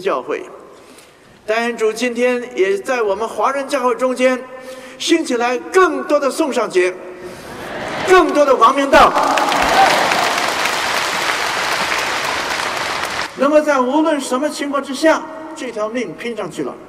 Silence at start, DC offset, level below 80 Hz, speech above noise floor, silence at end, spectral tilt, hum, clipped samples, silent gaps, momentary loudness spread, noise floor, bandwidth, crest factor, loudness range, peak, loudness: 0 s; under 0.1%; -48 dBFS; 29 dB; 0 s; -2.5 dB/octave; none; under 0.1%; none; 14 LU; -44 dBFS; 16 kHz; 14 dB; 5 LU; -2 dBFS; -16 LUFS